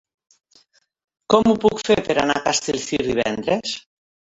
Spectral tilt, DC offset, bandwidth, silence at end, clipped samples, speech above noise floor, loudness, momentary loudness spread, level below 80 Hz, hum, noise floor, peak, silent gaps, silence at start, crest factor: -3.5 dB/octave; under 0.1%; 8.2 kHz; 0.55 s; under 0.1%; 39 dB; -20 LUFS; 7 LU; -52 dBFS; none; -58 dBFS; -2 dBFS; none; 1.3 s; 20 dB